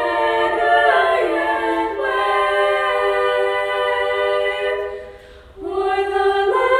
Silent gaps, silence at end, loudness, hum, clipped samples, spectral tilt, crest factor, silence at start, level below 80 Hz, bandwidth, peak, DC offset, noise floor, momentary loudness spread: none; 0 s; -18 LUFS; none; under 0.1%; -3.5 dB/octave; 16 dB; 0 s; -48 dBFS; 13 kHz; -2 dBFS; under 0.1%; -40 dBFS; 8 LU